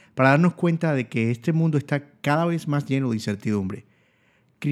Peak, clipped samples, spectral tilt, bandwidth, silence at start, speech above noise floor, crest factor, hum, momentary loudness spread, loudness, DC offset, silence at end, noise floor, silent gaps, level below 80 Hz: -2 dBFS; under 0.1%; -7.5 dB/octave; 12.5 kHz; 0.15 s; 40 dB; 20 dB; none; 9 LU; -23 LUFS; under 0.1%; 0 s; -63 dBFS; none; -70 dBFS